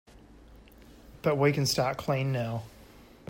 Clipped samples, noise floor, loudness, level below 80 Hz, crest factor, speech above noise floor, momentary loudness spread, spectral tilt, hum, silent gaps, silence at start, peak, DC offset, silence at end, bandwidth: under 0.1%; -53 dBFS; -29 LUFS; -56 dBFS; 18 dB; 25 dB; 11 LU; -5 dB/octave; none; none; 0.15 s; -12 dBFS; under 0.1%; 0.25 s; 16.5 kHz